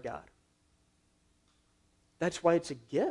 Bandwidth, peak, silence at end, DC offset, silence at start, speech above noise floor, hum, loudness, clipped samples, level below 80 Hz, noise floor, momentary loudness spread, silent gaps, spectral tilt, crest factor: 11.5 kHz; -12 dBFS; 0 s; under 0.1%; 0.05 s; 40 dB; none; -32 LUFS; under 0.1%; -68 dBFS; -71 dBFS; 14 LU; none; -5.5 dB/octave; 22 dB